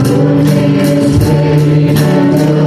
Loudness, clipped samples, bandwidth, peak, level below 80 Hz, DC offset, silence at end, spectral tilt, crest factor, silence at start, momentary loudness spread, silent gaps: -9 LUFS; under 0.1%; 14.5 kHz; 0 dBFS; -32 dBFS; under 0.1%; 0 s; -7.5 dB/octave; 8 dB; 0 s; 1 LU; none